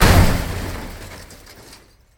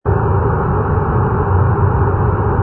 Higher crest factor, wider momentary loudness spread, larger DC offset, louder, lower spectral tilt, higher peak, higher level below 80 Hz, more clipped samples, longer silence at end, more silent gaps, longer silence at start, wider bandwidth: first, 18 dB vs 12 dB; first, 26 LU vs 2 LU; neither; second, -19 LUFS vs -15 LUFS; second, -5 dB/octave vs -13 dB/octave; about the same, 0 dBFS vs -2 dBFS; about the same, -24 dBFS vs -24 dBFS; neither; first, 0.85 s vs 0 s; neither; about the same, 0 s vs 0.05 s; first, 18.5 kHz vs 3 kHz